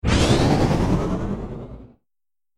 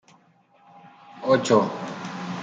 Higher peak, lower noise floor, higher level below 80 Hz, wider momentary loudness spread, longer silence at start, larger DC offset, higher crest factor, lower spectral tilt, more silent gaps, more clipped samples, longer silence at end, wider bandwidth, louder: about the same, -4 dBFS vs -6 dBFS; first, under -90 dBFS vs -59 dBFS; first, -30 dBFS vs -72 dBFS; first, 18 LU vs 14 LU; second, 0.05 s vs 0.75 s; neither; about the same, 16 dB vs 20 dB; about the same, -6 dB/octave vs -5.5 dB/octave; neither; neither; first, 0.7 s vs 0 s; first, 13.5 kHz vs 9.4 kHz; first, -20 LUFS vs -24 LUFS